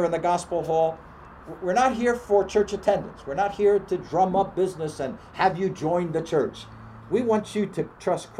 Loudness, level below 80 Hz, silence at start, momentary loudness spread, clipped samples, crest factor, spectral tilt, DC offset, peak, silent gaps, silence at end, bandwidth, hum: -25 LUFS; -52 dBFS; 0 s; 11 LU; under 0.1%; 18 dB; -6 dB/octave; under 0.1%; -8 dBFS; none; 0 s; 12.5 kHz; none